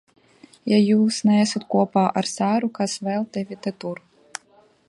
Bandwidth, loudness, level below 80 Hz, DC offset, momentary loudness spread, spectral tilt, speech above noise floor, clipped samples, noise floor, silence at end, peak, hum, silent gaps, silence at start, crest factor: 11.5 kHz; -21 LUFS; -70 dBFS; under 0.1%; 19 LU; -5.5 dB/octave; 36 dB; under 0.1%; -57 dBFS; 0.95 s; -4 dBFS; none; none; 0.65 s; 18 dB